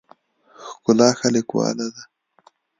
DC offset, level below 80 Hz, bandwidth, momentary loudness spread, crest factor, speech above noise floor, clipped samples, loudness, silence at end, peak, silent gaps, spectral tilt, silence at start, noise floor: under 0.1%; -66 dBFS; 9.4 kHz; 19 LU; 20 dB; 39 dB; under 0.1%; -20 LUFS; 0.75 s; -2 dBFS; none; -4.5 dB/octave; 0.6 s; -57 dBFS